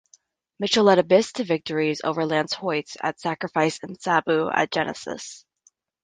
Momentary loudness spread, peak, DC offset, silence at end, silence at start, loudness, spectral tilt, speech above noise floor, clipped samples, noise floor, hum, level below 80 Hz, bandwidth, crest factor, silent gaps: 13 LU; -4 dBFS; under 0.1%; 0.65 s; 0.6 s; -23 LUFS; -4.5 dB/octave; 41 dB; under 0.1%; -64 dBFS; none; -66 dBFS; 9.8 kHz; 20 dB; none